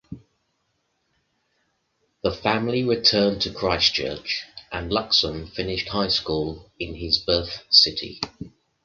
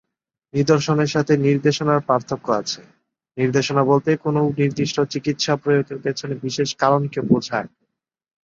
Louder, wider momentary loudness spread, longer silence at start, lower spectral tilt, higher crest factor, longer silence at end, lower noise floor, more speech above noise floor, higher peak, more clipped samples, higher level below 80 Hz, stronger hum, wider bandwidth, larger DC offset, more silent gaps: about the same, -22 LUFS vs -20 LUFS; first, 16 LU vs 9 LU; second, 0.1 s vs 0.55 s; second, -4 dB/octave vs -6 dB/octave; first, 24 dB vs 18 dB; second, 0.35 s vs 0.8 s; second, -72 dBFS vs -76 dBFS; second, 49 dB vs 56 dB; about the same, -2 dBFS vs -2 dBFS; neither; first, -46 dBFS vs -58 dBFS; neither; about the same, 7.6 kHz vs 7.6 kHz; neither; neither